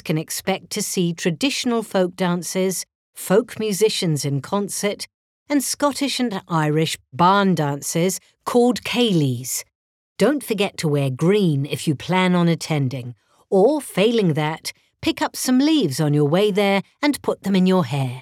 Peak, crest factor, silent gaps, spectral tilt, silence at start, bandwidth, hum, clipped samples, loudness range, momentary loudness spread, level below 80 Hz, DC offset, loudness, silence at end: -4 dBFS; 16 dB; 2.95-3.13 s, 5.14-5.46 s, 9.75-10.16 s; -5 dB/octave; 0.05 s; 16.5 kHz; none; under 0.1%; 3 LU; 8 LU; -62 dBFS; under 0.1%; -20 LUFS; 0 s